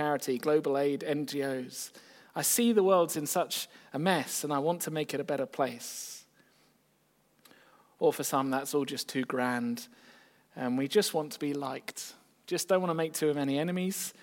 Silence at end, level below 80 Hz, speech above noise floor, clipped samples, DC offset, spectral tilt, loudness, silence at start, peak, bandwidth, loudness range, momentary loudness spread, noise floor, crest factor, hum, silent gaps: 0.1 s; -84 dBFS; 39 dB; under 0.1%; under 0.1%; -4 dB/octave; -31 LUFS; 0 s; -12 dBFS; 17 kHz; 6 LU; 13 LU; -70 dBFS; 20 dB; none; none